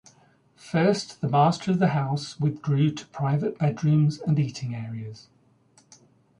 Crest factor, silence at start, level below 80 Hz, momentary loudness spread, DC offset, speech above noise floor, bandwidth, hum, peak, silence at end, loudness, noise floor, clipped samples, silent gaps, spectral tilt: 16 dB; 0.65 s; -62 dBFS; 11 LU; under 0.1%; 36 dB; 10.5 kHz; none; -10 dBFS; 1.2 s; -25 LUFS; -60 dBFS; under 0.1%; none; -7 dB/octave